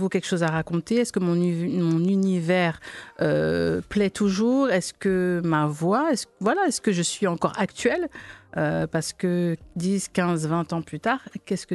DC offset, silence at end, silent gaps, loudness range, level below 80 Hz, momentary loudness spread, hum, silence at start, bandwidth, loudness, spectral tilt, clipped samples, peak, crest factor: under 0.1%; 0 s; none; 3 LU; -54 dBFS; 6 LU; none; 0 s; 12.5 kHz; -24 LUFS; -5.5 dB/octave; under 0.1%; -8 dBFS; 16 dB